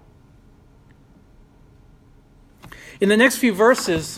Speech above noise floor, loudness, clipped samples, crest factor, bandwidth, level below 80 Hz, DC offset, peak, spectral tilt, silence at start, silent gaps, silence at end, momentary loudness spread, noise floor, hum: 34 dB; -17 LUFS; under 0.1%; 22 dB; 16 kHz; -52 dBFS; under 0.1%; 0 dBFS; -4 dB/octave; 2.65 s; none; 0 s; 22 LU; -51 dBFS; none